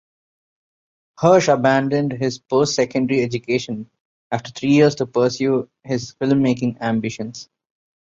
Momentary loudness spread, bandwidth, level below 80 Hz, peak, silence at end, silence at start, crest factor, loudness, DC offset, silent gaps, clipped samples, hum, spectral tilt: 12 LU; 7.6 kHz; -58 dBFS; -2 dBFS; 0.75 s; 1.2 s; 18 dB; -19 LUFS; under 0.1%; 4.00-4.31 s; under 0.1%; none; -5.5 dB/octave